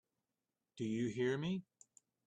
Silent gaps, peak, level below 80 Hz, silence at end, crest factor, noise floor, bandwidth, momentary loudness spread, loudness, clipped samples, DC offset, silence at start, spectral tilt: none; -26 dBFS; -78 dBFS; 0.65 s; 16 dB; under -90 dBFS; 9.2 kHz; 8 LU; -40 LUFS; under 0.1%; under 0.1%; 0.75 s; -6.5 dB/octave